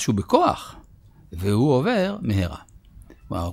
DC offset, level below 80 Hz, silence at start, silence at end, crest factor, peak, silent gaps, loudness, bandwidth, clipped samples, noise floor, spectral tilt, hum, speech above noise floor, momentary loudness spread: under 0.1%; -44 dBFS; 0 s; 0 s; 20 dB; -2 dBFS; none; -22 LUFS; 16 kHz; under 0.1%; -50 dBFS; -6.5 dB/octave; none; 29 dB; 18 LU